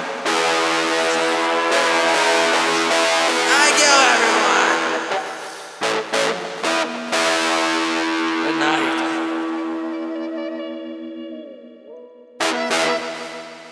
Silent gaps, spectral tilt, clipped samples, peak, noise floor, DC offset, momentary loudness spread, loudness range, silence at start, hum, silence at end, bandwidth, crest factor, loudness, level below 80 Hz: none; -1 dB/octave; under 0.1%; 0 dBFS; -41 dBFS; under 0.1%; 16 LU; 11 LU; 0 s; none; 0 s; 11 kHz; 20 dB; -18 LUFS; -76 dBFS